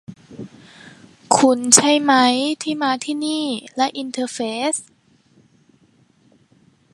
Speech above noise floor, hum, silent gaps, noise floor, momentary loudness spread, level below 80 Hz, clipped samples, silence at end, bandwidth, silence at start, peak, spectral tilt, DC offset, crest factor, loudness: 39 dB; none; none; -57 dBFS; 24 LU; -68 dBFS; under 0.1%; 2.1 s; 16 kHz; 0.1 s; 0 dBFS; -2 dB/octave; under 0.1%; 20 dB; -17 LUFS